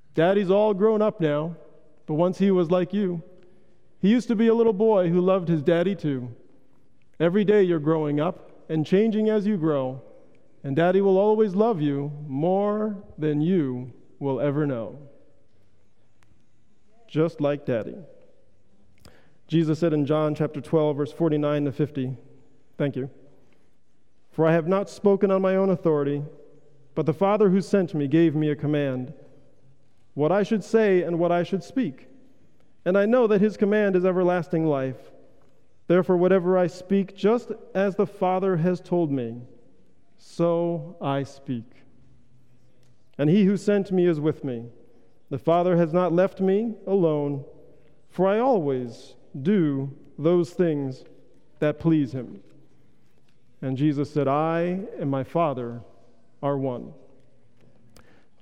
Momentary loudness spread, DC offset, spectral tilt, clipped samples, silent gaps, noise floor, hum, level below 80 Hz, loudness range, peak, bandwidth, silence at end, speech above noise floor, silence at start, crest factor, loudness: 13 LU; 0.4%; -8.5 dB/octave; under 0.1%; none; -68 dBFS; none; -66 dBFS; 7 LU; -8 dBFS; 10.5 kHz; 1.5 s; 45 dB; 0.15 s; 16 dB; -23 LUFS